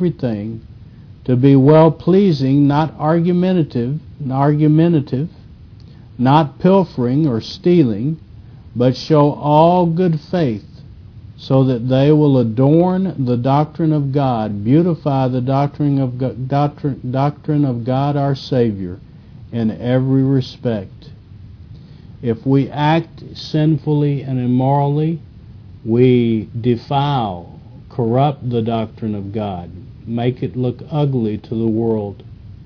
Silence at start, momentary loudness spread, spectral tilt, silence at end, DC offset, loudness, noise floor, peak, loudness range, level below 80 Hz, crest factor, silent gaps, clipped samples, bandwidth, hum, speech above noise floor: 0 s; 12 LU; -9.5 dB/octave; 0.05 s; under 0.1%; -16 LUFS; -39 dBFS; 0 dBFS; 6 LU; -46 dBFS; 16 dB; none; under 0.1%; 5.4 kHz; none; 24 dB